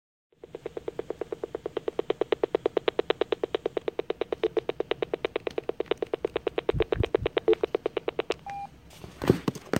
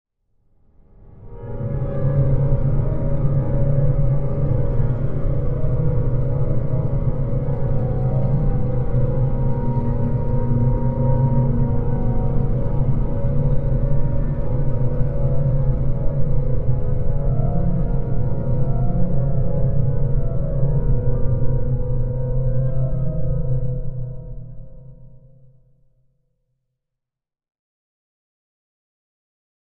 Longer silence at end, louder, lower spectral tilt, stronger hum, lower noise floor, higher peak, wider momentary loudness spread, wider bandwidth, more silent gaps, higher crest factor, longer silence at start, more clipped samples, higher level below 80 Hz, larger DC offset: second, 0 s vs 4.6 s; second, -30 LUFS vs -22 LUFS; second, -6.5 dB/octave vs -13 dB/octave; neither; second, -48 dBFS vs -86 dBFS; about the same, -6 dBFS vs -4 dBFS; first, 11 LU vs 4 LU; first, 16 kHz vs 2.4 kHz; neither; first, 24 dB vs 14 dB; second, 0.55 s vs 1.1 s; neither; second, -50 dBFS vs -24 dBFS; neither